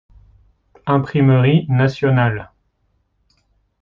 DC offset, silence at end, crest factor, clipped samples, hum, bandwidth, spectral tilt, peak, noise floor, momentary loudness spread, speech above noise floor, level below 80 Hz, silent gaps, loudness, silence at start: under 0.1%; 1.35 s; 16 dB; under 0.1%; none; 6 kHz; -9 dB/octave; -4 dBFS; -65 dBFS; 9 LU; 50 dB; -50 dBFS; none; -16 LUFS; 0.85 s